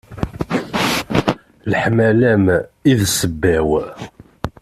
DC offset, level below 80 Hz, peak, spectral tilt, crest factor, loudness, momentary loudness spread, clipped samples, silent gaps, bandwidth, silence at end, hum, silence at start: under 0.1%; -40 dBFS; -2 dBFS; -5 dB/octave; 16 dB; -17 LUFS; 16 LU; under 0.1%; none; 14.5 kHz; 0.15 s; none; 0.1 s